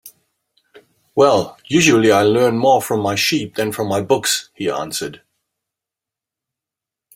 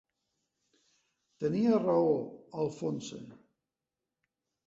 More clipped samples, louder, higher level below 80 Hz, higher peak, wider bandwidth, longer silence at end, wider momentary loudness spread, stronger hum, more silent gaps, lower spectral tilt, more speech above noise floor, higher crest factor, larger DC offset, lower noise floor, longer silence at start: neither; first, -16 LUFS vs -31 LUFS; first, -58 dBFS vs -74 dBFS; first, 0 dBFS vs -16 dBFS; first, 16.5 kHz vs 7.8 kHz; first, 2 s vs 1.3 s; second, 11 LU vs 16 LU; neither; neither; second, -4 dB/octave vs -7.5 dB/octave; first, 70 dB vs 60 dB; about the same, 18 dB vs 18 dB; neither; second, -86 dBFS vs -90 dBFS; second, 0.05 s vs 1.4 s